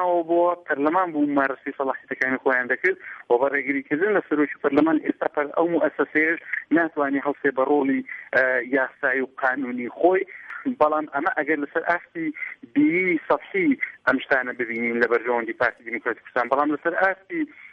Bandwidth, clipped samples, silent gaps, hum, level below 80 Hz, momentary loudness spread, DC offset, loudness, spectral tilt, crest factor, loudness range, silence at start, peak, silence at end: 6 kHz; under 0.1%; none; none; -68 dBFS; 7 LU; under 0.1%; -23 LUFS; -7.5 dB/octave; 18 dB; 1 LU; 0 s; -6 dBFS; 0.05 s